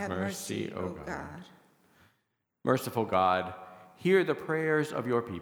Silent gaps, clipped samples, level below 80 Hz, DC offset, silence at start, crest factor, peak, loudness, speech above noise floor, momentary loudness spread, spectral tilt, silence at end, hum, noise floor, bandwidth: none; under 0.1%; -64 dBFS; under 0.1%; 0 s; 20 dB; -10 dBFS; -30 LUFS; 49 dB; 14 LU; -5.5 dB/octave; 0 s; none; -79 dBFS; over 20 kHz